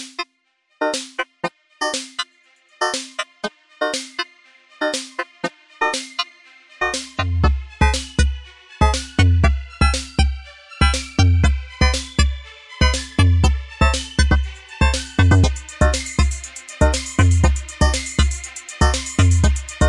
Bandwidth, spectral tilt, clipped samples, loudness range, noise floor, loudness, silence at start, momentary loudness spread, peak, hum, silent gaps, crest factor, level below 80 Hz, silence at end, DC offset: 11.5 kHz; -4.5 dB/octave; under 0.1%; 7 LU; -65 dBFS; -20 LUFS; 0 s; 13 LU; -2 dBFS; none; none; 16 dB; -24 dBFS; 0 s; under 0.1%